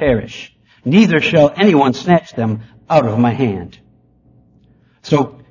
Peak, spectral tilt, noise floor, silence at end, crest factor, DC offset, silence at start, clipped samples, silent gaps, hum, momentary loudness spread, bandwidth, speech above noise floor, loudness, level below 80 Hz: 0 dBFS; -7 dB/octave; -51 dBFS; 0.2 s; 16 dB; under 0.1%; 0 s; under 0.1%; none; none; 16 LU; 7.4 kHz; 38 dB; -14 LUFS; -44 dBFS